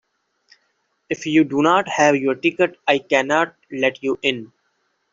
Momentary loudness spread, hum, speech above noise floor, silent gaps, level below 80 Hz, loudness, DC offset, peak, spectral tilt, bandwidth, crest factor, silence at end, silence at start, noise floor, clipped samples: 8 LU; none; 50 dB; none; -64 dBFS; -19 LUFS; under 0.1%; -2 dBFS; -4.5 dB/octave; 7.6 kHz; 18 dB; 0.65 s; 1.1 s; -69 dBFS; under 0.1%